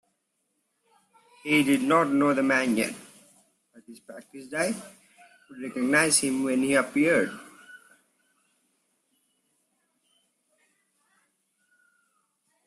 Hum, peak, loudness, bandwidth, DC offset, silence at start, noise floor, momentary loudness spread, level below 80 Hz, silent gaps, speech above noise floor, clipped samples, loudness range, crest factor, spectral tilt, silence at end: none; -6 dBFS; -24 LUFS; 14.5 kHz; under 0.1%; 1.45 s; -77 dBFS; 22 LU; -72 dBFS; none; 52 dB; under 0.1%; 6 LU; 22 dB; -3.5 dB/octave; 4.9 s